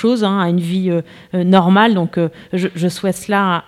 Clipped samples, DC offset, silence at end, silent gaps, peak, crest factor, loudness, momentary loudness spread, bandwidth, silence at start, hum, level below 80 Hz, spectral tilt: under 0.1%; under 0.1%; 0.05 s; none; 0 dBFS; 16 dB; -16 LUFS; 9 LU; 13 kHz; 0 s; none; -58 dBFS; -6.5 dB/octave